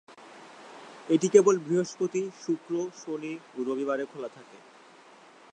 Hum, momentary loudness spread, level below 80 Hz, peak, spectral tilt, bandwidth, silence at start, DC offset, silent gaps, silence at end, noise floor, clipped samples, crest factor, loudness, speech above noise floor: none; 26 LU; -84 dBFS; -6 dBFS; -5.5 dB/octave; 9.4 kHz; 0.1 s; under 0.1%; none; 0.95 s; -54 dBFS; under 0.1%; 24 dB; -28 LUFS; 26 dB